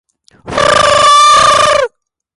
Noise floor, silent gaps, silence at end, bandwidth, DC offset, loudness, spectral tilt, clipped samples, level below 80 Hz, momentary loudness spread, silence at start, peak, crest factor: -30 dBFS; none; 0.5 s; 11.5 kHz; under 0.1%; -7 LUFS; -1.5 dB/octave; under 0.1%; -38 dBFS; 11 LU; 0.45 s; 0 dBFS; 10 dB